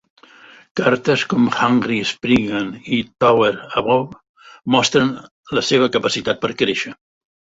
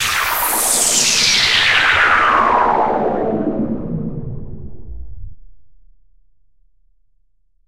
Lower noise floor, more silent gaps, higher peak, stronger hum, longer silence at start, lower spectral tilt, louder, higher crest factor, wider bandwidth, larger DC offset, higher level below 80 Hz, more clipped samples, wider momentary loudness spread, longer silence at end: second, -45 dBFS vs -63 dBFS; first, 4.29-4.34 s, 5.31-5.44 s vs none; about the same, -2 dBFS vs -2 dBFS; neither; first, 0.75 s vs 0 s; first, -4.5 dB/octave vs -1.5 dB/octave; second, -18 LUFS vs -13 LUFS; about the same, 18 dB vs 16 dB; second, 8 kHz vs 16 kHz; second, under 0.1% vs 1%; second, -52 dBFS vs -38 dBFS; neither; second, 9 LU vs 20 LU; first, 0.65 s vs 0 s